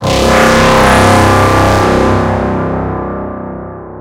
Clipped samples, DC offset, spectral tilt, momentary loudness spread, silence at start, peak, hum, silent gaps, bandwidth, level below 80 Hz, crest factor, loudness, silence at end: 0.5%; under 0.1%; -5 dB/octave; 15 LU; 0 s; 0 dBFS; none; none; 16.5 kHz; -22 dBFS; 10 dB; -9 LUFS; 0 s